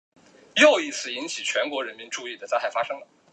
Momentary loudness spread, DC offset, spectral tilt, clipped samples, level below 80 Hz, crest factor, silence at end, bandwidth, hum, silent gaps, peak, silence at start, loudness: 16 LU; under 0.1%; -1 dB/octave; under 0.1%; -84 dBFS; 22 dB; 0.3 s; 10 kHz; none; none; -4 dBFS; 0.55 s; -24 LUFS